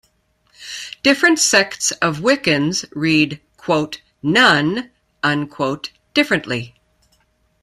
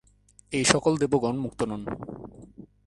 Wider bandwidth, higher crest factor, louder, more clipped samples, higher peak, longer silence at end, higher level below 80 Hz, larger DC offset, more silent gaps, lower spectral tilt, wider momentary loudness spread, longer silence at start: first, 15 kHz vs 11.5 kHz; second, 18 dB vs 26 dB; first, -17 LUFS vs -26 LUFS; neither; about the same, 0 dBFS vs -2 dBFS; first, 0.95 s vs 0.2 s; about the same, -56 dBFS vs -54 dBFS; neither; neither; about the same, -3 dB/octave vs -4 dB/octave; second, 16 LU vs 19 LU; about the same, 0.6 s vs 0.5 s